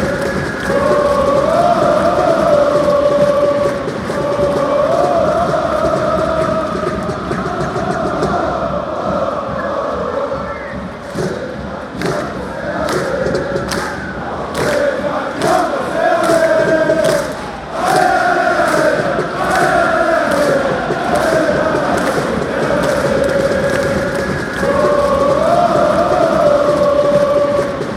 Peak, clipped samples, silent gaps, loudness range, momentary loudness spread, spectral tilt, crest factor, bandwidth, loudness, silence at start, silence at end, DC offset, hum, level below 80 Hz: -2 dBFS; under 0.1%; none; 7 LU; 8 LU; -5.5 dB/octave; 12 dB; 15 kHz; -15 LUFS; 0 s; 0 s; under 0.1%; none; -36 dBFS